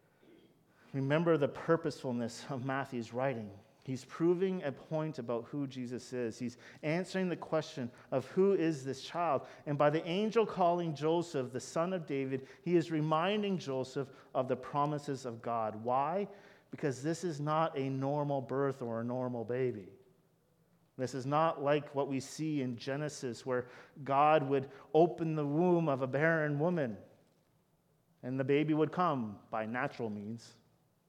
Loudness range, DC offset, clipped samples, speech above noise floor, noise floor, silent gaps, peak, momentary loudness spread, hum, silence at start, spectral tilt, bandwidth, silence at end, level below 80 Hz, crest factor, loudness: 5 LU; under 0.1%; under 0.1%; 39 dB; -73 dBFS; none; -14 dBFS; 11 LU; none; 0.95 s; -6.5 dB/octave; 13 kHz; 0.55 s; -80 dBFS; 20 dB; -35 LUFS